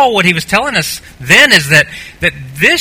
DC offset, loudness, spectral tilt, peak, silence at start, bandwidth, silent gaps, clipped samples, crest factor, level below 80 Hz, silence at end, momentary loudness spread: under 0.1%; -9 LUFS; -3 dB/octave; 0 dBFS; 0 s; over 20 kHz; none; 2%; 10 dB; -38 dBFS; 0 s; 12 LU